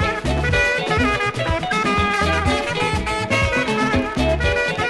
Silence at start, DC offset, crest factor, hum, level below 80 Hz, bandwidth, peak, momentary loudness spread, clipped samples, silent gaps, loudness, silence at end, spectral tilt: 0 s; under 0.1%; 14 dB; none; -30 dBFS; 11.5 kHz; -6 dBFS; 3 LU; under 0.1%; none; -19 LUFS; 0 s; -5 dB/octave